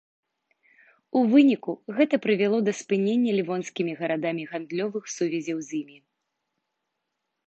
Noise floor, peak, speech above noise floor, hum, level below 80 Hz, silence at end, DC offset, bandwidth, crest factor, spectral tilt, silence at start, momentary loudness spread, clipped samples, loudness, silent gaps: -81 dBFS; -6 dBFS; 57 dB; none; -80 dBFS; 1.65 s; under 0.1%; 8.2 kHz; 20 dB; -5.5 dB/octave; 1.15 s; 12 LU; under 0.1%; -25 LUFS; none